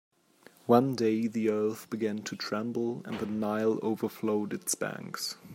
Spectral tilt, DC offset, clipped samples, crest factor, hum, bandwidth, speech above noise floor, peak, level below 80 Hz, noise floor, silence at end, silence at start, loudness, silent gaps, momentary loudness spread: -5 dB/octave; under 0.1%; under 0.1%; 22 dB; none; 16 kHz; 30 dB; -10 dBFS; -76 dBFS; -60 dBFS; 0 s; 0.65 s; -31 LUFS; none; 10 LU